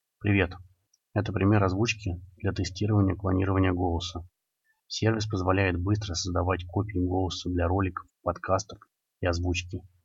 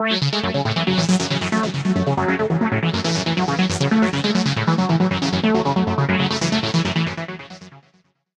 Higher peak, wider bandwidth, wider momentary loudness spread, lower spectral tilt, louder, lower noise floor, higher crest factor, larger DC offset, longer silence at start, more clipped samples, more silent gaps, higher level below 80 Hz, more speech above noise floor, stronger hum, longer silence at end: second, -10 dBFS vs -4 dBFS; second, 7.8 kHz vs 10.5 kHz; first, 8 LU vs 3 LU; about the same, -6 dB/octave vs -5.5 dB/octave; second, -28 LUFS vs -19 LUFS; first, -75 dBFS vs -60 dBFS; about the same, 18 dB vs 16 dB; neither; first, 0.2 s vs 0 s; neither; neither; about the same, -52 dBFS vs -50 dBFS; first, 48 dB vs 40 dB; neither; second, 0.2 s vs 0.6 s